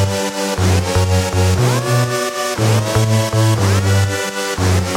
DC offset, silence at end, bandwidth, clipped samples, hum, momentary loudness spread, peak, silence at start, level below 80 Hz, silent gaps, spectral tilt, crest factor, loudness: under 0.1%; 0 s; 16.5 kHz; under 0.1%; none; 4 LU; -2 dBFS; 0 s; -36 dBFS; none; -5 dB/octave; 12 dB; -16 LUFS